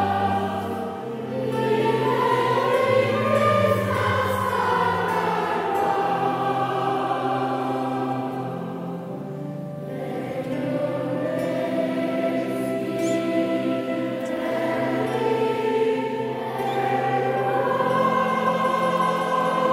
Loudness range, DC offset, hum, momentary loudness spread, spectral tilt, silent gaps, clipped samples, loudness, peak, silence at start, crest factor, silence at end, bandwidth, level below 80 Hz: 7 LU; under 0.1%; none; 9 LU; -6.5 dB/octave; none; under 0.1%; -23 LUFS; -8 dBFS; 0 s; 16 dB; 0 s; 16 kHz; -64 dBFS